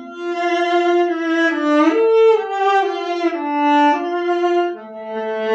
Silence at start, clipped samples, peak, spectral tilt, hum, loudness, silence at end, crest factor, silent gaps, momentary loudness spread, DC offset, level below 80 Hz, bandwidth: 0 s; under 0.1%; -2 dBFS; -3.5 dB/octave; none; -17 LUFS; 0 s; 14 dB; none; 10 LU; under 0.1%; -76 dBFS; 7.8 kHz